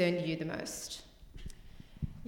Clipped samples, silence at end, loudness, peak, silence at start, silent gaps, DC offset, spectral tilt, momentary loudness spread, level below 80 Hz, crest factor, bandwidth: under 0.1%; 0 s; -38 LUFS; -16 dBFS; 0 s; none; under 0.1%; -5 dB/octave; 21 LU; -52 dBFS; 20 dB; 17.5 kHz